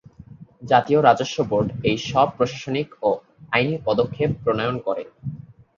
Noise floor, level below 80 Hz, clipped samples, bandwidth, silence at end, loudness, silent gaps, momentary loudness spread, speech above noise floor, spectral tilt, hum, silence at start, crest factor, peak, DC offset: -44 dBFS; -52 dBFS; under 0.1%; 7.4 kHz; 0.4 s; -21 LUFS; none; 12 LU; 24 dB; -6 dB/octave; none; 0.2 s; 20 dB; -2 dBFS; under 0.1%